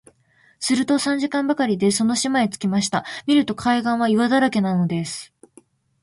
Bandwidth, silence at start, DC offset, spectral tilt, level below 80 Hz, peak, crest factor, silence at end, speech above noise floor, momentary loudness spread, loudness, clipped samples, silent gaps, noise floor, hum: 11.5 kHz; 0.6 s; under 0.1%; -4.5 dB/octave; -60 dBFS; -6 dBFS; 14 dB; 0.75 s; 39 dB; 6 LU; -20 LUFS; under 0.1%; none; -58 dBFS; none